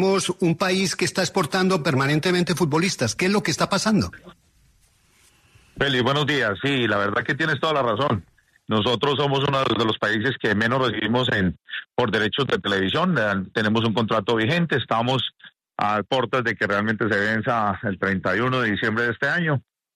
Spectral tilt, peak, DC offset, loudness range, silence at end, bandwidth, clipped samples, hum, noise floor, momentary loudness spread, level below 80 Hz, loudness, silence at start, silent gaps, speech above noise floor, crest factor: -5 dB/octave; -8 dBFS; under 0.1%; 3 LU; 0.35 s; 13.5 kHz; under 0.1%; none; -60 dBFS; 3 LU; -54 dBFS; -22 LUFS; 0 s; none; 38 dB; 14 dB